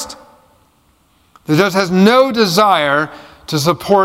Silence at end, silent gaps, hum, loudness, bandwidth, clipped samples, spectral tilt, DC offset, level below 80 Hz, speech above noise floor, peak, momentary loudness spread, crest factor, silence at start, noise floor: 0 s; none; none; -13 LUFS; 16.5 kHz; under 0.1%; -5 dB/octave; under 0.1%; -52 dBFS; 43 dB; 0 dBFS; 16 LU; 14 dB; 0 s; -55 dBFS